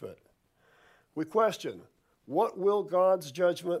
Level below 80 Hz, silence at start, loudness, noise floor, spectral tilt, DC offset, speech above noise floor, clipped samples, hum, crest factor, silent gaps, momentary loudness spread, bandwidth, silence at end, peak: -80 dBFS; 0 s; -29 LUFS; -67 dBFS; -5.5 dB/octave; under 0.1%; 38 dB; under 0.1%; none; 16 dB; none; 16 LU; 15 kHz; 0 s; -14 dBFS